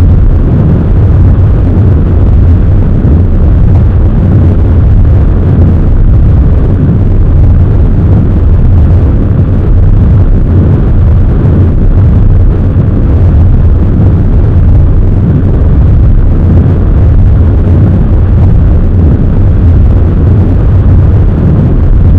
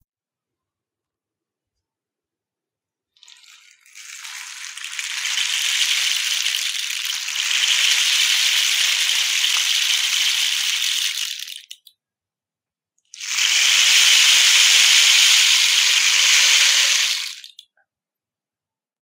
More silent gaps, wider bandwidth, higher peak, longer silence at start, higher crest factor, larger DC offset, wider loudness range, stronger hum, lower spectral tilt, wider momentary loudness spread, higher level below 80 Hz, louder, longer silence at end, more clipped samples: neither; second, 3.6 kHz vs 16.5 kHz; about the same, 0 dBFS vs 0 dBFS; second, 0 s vs 3.95 s; second, 4 dB vs 20 dB; neither; second, 0 LU vs 11 LU; neither; first, -11.5 dB/octave vs 9 dB/octave; second, 2 LU vs 18 LU; first, -6 dBFS vs -78 dBFS; first, -6 LUFS vs -14 LUFS; second, 0 s vs 1.6 s; first, 10% vs under 0.1%